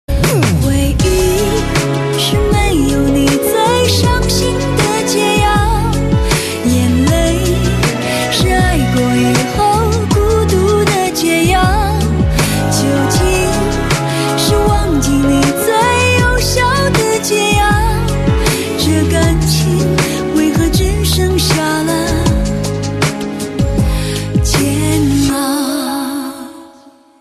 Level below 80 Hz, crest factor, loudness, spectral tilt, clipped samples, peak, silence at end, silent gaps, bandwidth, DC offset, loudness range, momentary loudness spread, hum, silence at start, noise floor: -20 dBFS; 12 dB; -13 LUFS; -5 dB/octave; under 0.1%; 0 dBFS; 0.3 s; none; 14 kHz; under 0.1%; 3 LU; 4 LU; none; 0.1 s; -42 dBFS